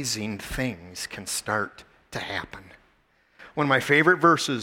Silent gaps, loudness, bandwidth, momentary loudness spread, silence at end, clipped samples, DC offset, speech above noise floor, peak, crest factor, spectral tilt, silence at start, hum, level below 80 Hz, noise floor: none; -24 LUFS; 17.5 kHz; 17 LU; 0 s; under 0.1%; under 0.1%; 39 dB; -6 dBFS; 20 dB; -4 dB/octave; 0 s; none; -50 dBFS; -64 dBFS